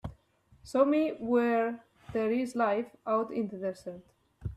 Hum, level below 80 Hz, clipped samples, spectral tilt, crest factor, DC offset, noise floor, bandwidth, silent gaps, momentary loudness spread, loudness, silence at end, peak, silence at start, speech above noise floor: none; -58 dBFS; under 0.1%; -7 dB/octave; 20 dB; under 0.1%; -64 dBFS; 13 kHz; none; 18 LU; -30 LUFS; 0 s; -12 dBFS; 0.05 s; 35 dB